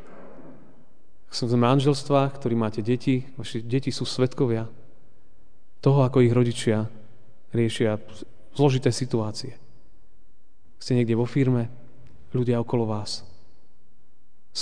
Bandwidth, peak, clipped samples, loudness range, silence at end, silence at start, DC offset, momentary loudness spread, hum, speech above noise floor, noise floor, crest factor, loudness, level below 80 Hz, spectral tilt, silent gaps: 10 kHz; -6 dBFS; under 0.1%; 4 LU; 0 s; 0.1 s; 2%; 15 LU; none; 41 dB; -65 dBFS; 20 dB; -24 LUFS; -62 dBFS; -6.5 dB/octave; none